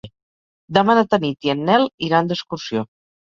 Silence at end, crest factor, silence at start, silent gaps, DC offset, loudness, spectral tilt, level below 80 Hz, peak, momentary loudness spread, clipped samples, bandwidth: 0.4 s; 20 dB; 0.05 s; 0.23-0.68 s, 1.94-1.98 s; under 0.1%; -19 LUFS; -6 dB/octave; -58 dBFS; 0 dBFS; 10 LU; under 0.1%; 7.4 kHz